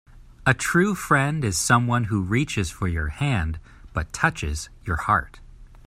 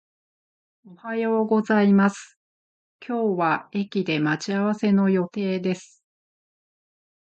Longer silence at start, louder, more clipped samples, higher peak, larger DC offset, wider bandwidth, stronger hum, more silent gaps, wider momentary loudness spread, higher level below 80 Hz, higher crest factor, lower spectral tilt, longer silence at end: second, 0.15 s vs 0.9 s; about the same, -23 LUFS vs -23 LUFS; neither; first, -4 dBFS vs -8 dBFS; neither; first, 16 kHz vs 8.6 kHz; neither; second, none vs 2.36-2.99 s; about the same, 11 LU vs 12 LU; first, -40 dBFS vs -72 dBFS; about the same, 20 dB vs 16 dB; second, -5 dB/octave vs -7 dB/octave; second, 0.1 s vs 1.45 s